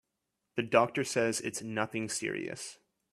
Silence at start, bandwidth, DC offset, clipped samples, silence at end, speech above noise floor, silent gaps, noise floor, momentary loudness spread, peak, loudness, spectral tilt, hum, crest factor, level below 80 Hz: 0.55 s; 14 kHz; under 0.1%; under 0.1%; 0.4 s; 52 dB; none; -84 dBFS; 13 LU; -10 dBFS; -32 LUFS; -3.5 dB/octave; none; 24 dB; -74 dBFS